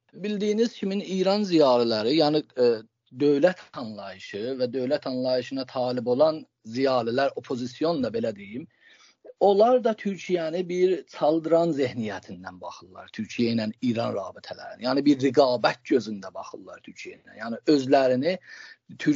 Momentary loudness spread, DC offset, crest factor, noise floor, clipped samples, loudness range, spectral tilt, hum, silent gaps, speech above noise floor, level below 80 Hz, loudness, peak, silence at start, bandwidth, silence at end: 19 LU; under 0.1%; 20 dB; -55 dBFS; under 0.1%; 4 LU; -4.5 dB/octave; none; none; 30 dB; -74 dBFS; -25 LUFS; -6 dBFS; 0.15 s; 7.6 kHz; 0 s